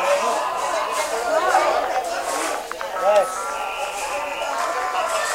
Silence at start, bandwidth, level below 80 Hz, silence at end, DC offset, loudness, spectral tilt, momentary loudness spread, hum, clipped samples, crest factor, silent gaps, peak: 0 s; 16 kHz; -56 dBFS; 0 s; under 0.1%; -22 LUFS; -0.5 dB/octave; 7 LU; none; under 0.1%; 16 dB; none; -6 dBFS